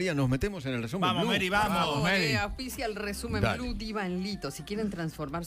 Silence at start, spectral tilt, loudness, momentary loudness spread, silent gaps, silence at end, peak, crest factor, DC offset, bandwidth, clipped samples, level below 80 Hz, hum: 0 s; -5 dB/octave; -30 LUFS; 9 LU; none; 0 s; -12 dBFS; 18 dB; under 0.1%; 16 kHz; under 0.1%; -46 dBFS; none